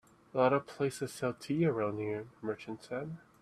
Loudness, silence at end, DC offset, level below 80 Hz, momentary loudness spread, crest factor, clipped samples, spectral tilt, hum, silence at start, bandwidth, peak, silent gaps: -35 LUFS; 0.25 s; under 0.1%; -72 dBFS; 11 LU; 20 dB; under 0.1%; -6.5 dB/octave; none; 0.35 s; 13.5 kHz; -14 dBFS; none